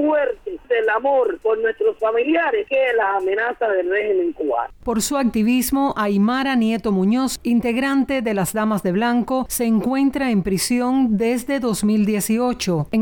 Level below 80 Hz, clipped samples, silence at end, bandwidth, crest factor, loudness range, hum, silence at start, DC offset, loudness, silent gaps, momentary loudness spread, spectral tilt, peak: -46 dBFS; under 0.1%; 0 s; 19.5 kHz; 10 dB; 1 LU; none; 0 s; under 0.1%; -19 LUFS; none; 3 LU; -5 dB/octave; -10 dBFS